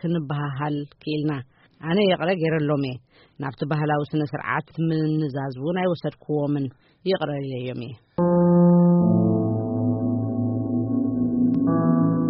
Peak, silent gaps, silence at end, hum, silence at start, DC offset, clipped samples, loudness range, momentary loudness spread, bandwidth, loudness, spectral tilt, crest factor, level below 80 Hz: -8 dBFS; none; 0 s; none; 0.05 s; under 0.1%; under 0.1%; 5 LU; 13 LU; 5.4 kHz; -23 LUFS; -7 dB/octave; 14 dB; -56 dBFS